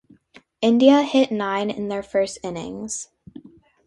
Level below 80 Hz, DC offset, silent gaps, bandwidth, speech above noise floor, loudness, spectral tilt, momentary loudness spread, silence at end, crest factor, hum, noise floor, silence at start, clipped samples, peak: -60 dBFS; under 0.1%; none; 11.5 kHz; 33 dB; -21 LUFS; -4.5 dB/octave; 16 LU; 0.8 s; 20 dB; none; -53 dBFS; 0.6 s; under 0.1%; -2 dBFS